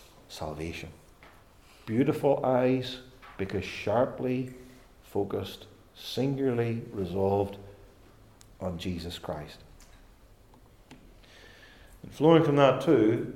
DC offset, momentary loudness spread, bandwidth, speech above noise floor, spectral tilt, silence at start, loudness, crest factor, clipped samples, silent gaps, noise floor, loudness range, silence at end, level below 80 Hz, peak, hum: under 0.1%; 23 LU; 16 kHz; 29 dB; -7 dB/octave; 0.3 s; -28 LUFS; 22 dB; under 0.1%; none; -56 dBFS; 13 LU; 0 s; -58 dBFS; -8 dBFS; none